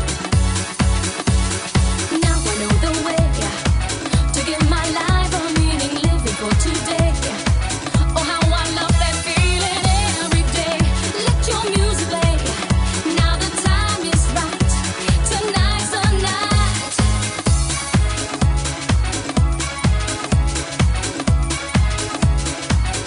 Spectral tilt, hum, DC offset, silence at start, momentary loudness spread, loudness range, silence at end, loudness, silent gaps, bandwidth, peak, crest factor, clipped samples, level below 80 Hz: -4 dB/octave; none; under 0.1%; 0 s; 3 LU; 2 LU; 0 s; -18 LUFS; none; 11 kHz; -4 dBFS; 14 dB; under 0.1%; -22 dBFS